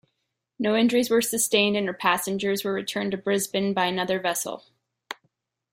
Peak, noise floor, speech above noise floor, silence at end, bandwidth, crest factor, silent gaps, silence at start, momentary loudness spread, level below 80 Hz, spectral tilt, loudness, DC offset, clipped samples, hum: -6 dBFS; -79 dBFS; 55 dB; 0.6 s; 16.5 kHz; 20 dB; none; 0.6 s; 16 LU; -68 dBFS; -3.5 dB/octave; -24 LUFS; under 0.1%; under 0.1%; none